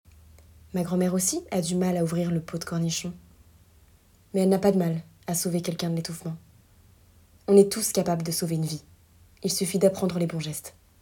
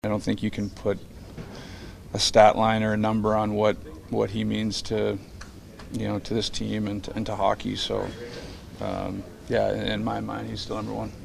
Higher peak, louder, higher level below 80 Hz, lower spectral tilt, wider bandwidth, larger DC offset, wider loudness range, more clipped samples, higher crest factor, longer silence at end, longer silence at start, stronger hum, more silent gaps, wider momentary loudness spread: about the same, -4 dBFS vs -4 dBFS; about the same, -26 LUFS vs -26 LUFS; second, -58 dBFS vs -46 dBFS; about the same, -5.5 dB/octave vs -5 dB/octave; first, 18 kHz vs 14.5 kHz; neither; second, 3 LU vs 6 LU; neither; about the same, 22 dB vs 24 dB; first, 0.3 s vs 0 s; first, 0.75 s vs 0.05 s; neither; neither; second, 13 LU vs 17 LU